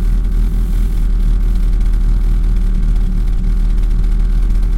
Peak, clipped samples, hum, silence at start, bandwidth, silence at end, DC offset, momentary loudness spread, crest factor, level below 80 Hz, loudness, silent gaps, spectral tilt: -4 dBFS; under 0.1%; none; 0 s; 4.4 kHz; 0 s; under 0.1%; 1 LU; 8 dB; -12 dBFS; -18 LUFS; none; -7.5 dB/octave